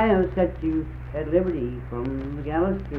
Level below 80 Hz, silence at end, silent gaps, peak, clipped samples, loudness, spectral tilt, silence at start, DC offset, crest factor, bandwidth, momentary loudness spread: -36 dBFS; 0 s; none; -8 dBFS; under 0.1%; -26 LUFS; -10 dB/octave; 0 s; under 0.1%; 16 dB; 5 kHz; 9 LU